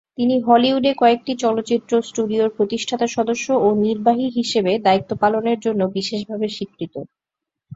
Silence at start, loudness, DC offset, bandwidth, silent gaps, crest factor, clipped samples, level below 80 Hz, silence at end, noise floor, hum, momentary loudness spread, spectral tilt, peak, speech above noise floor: 0.2 s; -19 LUFS; under 0.1%; 8 kHz; none; 18 dB; under 0.1%; -60 dBFS; 0 s; -85 dBFS; none; 9 LU; -5 dB/octave; -2 dBFS; 66 dB